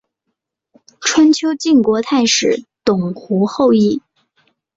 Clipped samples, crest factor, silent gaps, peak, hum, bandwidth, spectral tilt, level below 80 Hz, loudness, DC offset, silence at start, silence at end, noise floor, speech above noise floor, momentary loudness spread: under 0.1%; 14 dB; none; 0 dBFS; none; 8 kHz; -4 dB/octave; -56 dBFS; -15 LUFS; under 0.1%; 1 s; 0.75 s; -75 dBFS; 61 dB; 7 LU